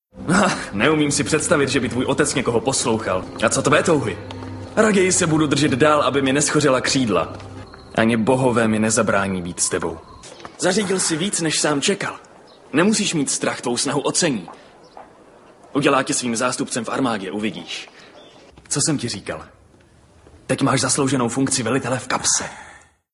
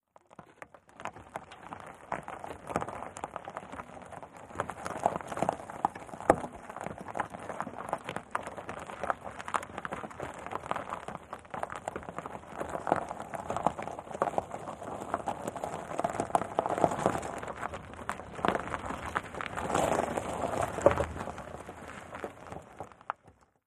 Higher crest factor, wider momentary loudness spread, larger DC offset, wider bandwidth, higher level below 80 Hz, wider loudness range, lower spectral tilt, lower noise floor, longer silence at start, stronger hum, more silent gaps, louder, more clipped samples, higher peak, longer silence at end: second, 20 dB vs 32 dB; about the same, 13 LU vs 15 LU; neither; about the same, 12 kHz vs 13 kHz; first, -48 dBFS vs -56 dBFS; about the same, 6 LU vs 8 LU; second, -3.5 dB/octave vs -5 dB/octave; second, -51 dBFS vs -62 dBFS; second, 0.15 s vs 0.4 s; neither; neither; first, -19 LUFS vs -35 LUFS; neither; first, 0 dBFS vs -4 dBFS; about the same, 0.35 s vs 0.35 s